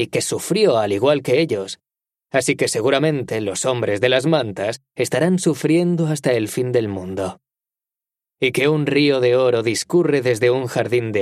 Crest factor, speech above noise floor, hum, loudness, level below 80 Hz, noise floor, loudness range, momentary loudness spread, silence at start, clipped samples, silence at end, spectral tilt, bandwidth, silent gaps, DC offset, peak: 18 dB; 71 dB; none; -19 LUFS; -62 dBFS; -90 dBFS; 3 LU; 9 LU; 0 s; under 0.1%; 0 s; -5 dB/octave; 15 kHz; none; under 0.1%; -2 dBFS